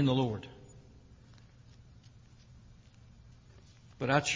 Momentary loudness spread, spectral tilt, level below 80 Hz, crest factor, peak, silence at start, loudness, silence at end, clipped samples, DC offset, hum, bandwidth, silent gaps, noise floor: 28 LU; -5 dB/octave; -60 dBFS; 22 dB; -14 dBFS; 0 s; -33 LUFS; 0 s; under 0.1%; under 0.1%; none; 7.6 kHz; none; -57 dBFS